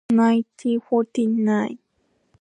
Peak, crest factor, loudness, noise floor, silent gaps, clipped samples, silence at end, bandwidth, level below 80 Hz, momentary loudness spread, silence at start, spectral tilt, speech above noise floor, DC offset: -8 dBFS; 14 dB; -21 LUFS; -68 dBFS; none; under 0.1%; 0.65 s; 9.4 kHz; -70 dBFS; 9 LU; 0.1 s; -7 dB/octave; 48 dB; under 0.1%